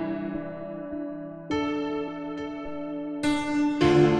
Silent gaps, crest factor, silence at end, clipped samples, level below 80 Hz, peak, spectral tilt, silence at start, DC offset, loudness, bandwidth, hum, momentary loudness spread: none; 18 dB; 0 s; under 0.1%; -54 dBFS; -8 dBFS; -6.5 dB/octave; 0 s; under 0.1%; -29 LUFS; 10.5 kHz; none; 13 LU